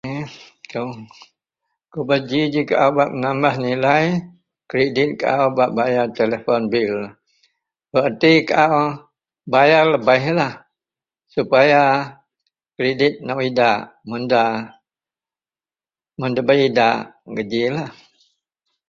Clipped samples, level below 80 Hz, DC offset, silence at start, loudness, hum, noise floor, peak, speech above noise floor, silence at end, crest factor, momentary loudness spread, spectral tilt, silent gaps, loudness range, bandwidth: under 0.1%; -60 dBFS; under 0.1%; 0.05 s; -18 LUFS; none; under -90 dBFS; 0 dBFS; over 73 dB; 1 s; 18 dB; 14 LU; -6.5 dB/octave; none; 5 LU; 7.4 kHz